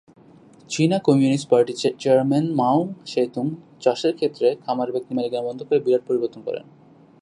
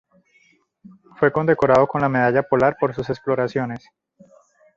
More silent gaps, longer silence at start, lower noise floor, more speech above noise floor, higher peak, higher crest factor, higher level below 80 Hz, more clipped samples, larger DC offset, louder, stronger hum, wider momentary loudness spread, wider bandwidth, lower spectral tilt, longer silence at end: neither; second, 0.7 s vs 1.2 s; second, -49 dBFS vs -60 dBFS; second, 28 dB vs 40 dB; about the same, -4 dBFS vs -2 dBFS; about the same, 18 dB vs 18 dB; second, -70 dBFS vs -54 dBFS; neither; neither; second, -22 LUFS vs -19 LUFS; neither; about the same, 10 LU vs 10 LU; first, 11 kHz vs 7.6 kHz; second, -6.5 dB/octave vs -8 dB/octave; second, 0.6 s vs 1 s